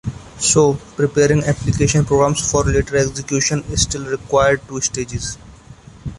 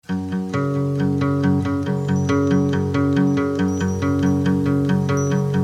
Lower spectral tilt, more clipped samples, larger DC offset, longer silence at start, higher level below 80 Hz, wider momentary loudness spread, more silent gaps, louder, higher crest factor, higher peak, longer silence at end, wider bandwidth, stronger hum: second, -4.5 dB/octave vs -7.5 dB/octave; neither; neither; about the same, 0.05 s vs 0.1 s; first, -34 dBFS vs -50 dBFS; first, 10 LU vs 4 LU; neither; first, -17 LUFS vs -20 LUFS; about the same, 16 dB vs 12 dB; first, -2 dBFS vs -6 dBFS; about the same, 0 s vs 0 s; first, 11.5 kHz vs 10 kHz; neither